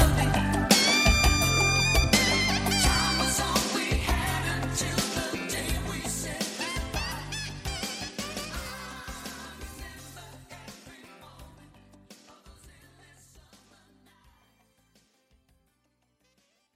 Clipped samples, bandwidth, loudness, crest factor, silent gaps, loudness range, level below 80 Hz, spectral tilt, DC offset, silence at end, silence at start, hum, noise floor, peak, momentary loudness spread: under 0.1%; 16 kHz; -25 LUFS; 22 dB; none; 22 LU; -36 dBFS; -3 dB/octave; under 0.1%; 4.05 s; 0 s; none; -72 dBFS; -8 dBFS; 21 LU